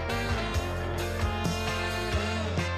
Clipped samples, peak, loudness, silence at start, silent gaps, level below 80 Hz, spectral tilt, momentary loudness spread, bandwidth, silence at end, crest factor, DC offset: under 0.1%; -16 dBFS; -30 LUFS; 0 s; none; -38 dBFS; -5 dB/octave; 2 LU; 15 kHz; 0 s; 14 dB; under 0.1%